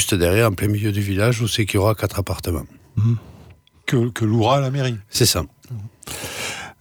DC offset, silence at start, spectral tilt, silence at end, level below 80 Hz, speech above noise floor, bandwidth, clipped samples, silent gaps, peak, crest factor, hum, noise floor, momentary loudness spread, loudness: under 0.1%; 0 s; -5 dB/octave; 0.1 s; -42 dBFS; 28 dB; over 20 kHz; under 0.1%; none; -4 dBFS; 16 dB; none; -47 dBFS; 13 LU; -20 LUFS